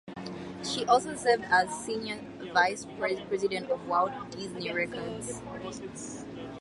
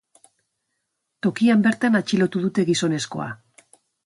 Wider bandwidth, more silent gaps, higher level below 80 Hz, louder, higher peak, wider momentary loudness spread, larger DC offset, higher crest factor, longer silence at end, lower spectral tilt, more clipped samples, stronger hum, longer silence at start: about the same, 11.5 kHz vs 11.5 kHz; neither; about the same, -62 dBFS vs -66 dBFS; second, -30 LUFS vs -21 LUFS; about the same, -10 dBFS vs -8 dBFS; about the same, 14 LU vs 13 LU; neither; about the same, 20 dB vs 16 dB; second, 0 s vs 0.7 s; second, -3.5 dB/octave vs -5.5 dB/octave; neither; neither; second, 0.05 s vs 1.25 s